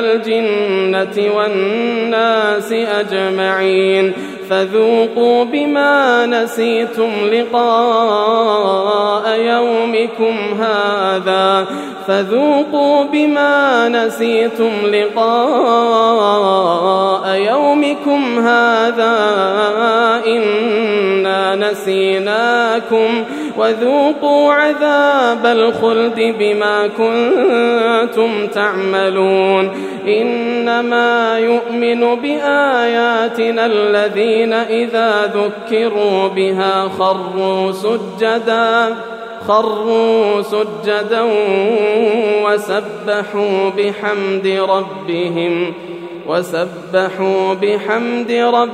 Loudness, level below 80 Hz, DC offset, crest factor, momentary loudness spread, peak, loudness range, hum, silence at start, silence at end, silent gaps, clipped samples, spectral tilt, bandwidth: -14 LUFS; -72 dBFS; under 0.1%; 14 dB; 5 LU; 0 dBFS; 3 LU; none; 0 s; 0 s; none; under 0.1%; -5 dB/octave; 14.5 kHz